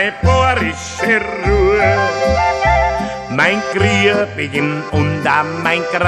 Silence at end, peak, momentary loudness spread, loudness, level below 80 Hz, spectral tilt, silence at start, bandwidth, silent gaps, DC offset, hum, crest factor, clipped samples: 0 s; 0 dBFS; 6 LU; -15 LUFS; -28 dBFS; -5.5 dB/octave; 0 s; 12.5 kHz; none; under 0.1%; none; 14 dB; under 0.1%